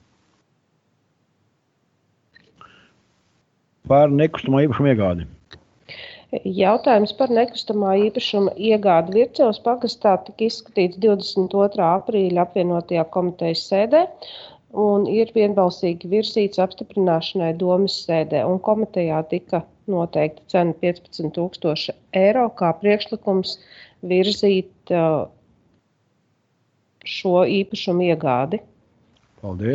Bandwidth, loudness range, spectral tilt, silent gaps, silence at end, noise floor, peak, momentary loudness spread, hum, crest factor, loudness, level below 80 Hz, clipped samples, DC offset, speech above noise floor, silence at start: 8 kHz; 4 LU; -7 dB/octave; none; 0 s; -67 dBFS; -4 dBFS; 10 LU; none; 18 dB; -20 LUFS; -58 dBFS; under 0.1%; under 0.1%; 48 dB; 3.85 s